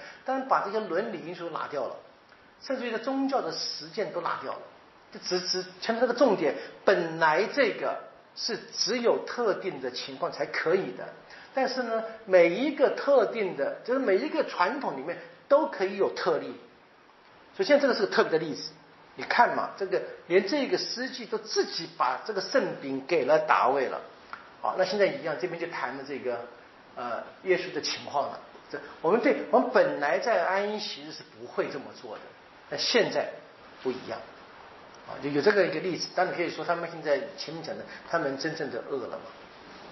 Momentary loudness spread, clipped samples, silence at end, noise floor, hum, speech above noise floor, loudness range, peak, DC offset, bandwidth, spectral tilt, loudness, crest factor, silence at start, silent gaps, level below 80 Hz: 17 LU; under 0.1%; 0 s; -57 dBFS; none; 29 dB; 6 LU; -6 dBFS; under 0.1%; 6.2 kHz; -2 dB/octave; -28 LUFS; 22 dB; 0 s; none; -76 dBFS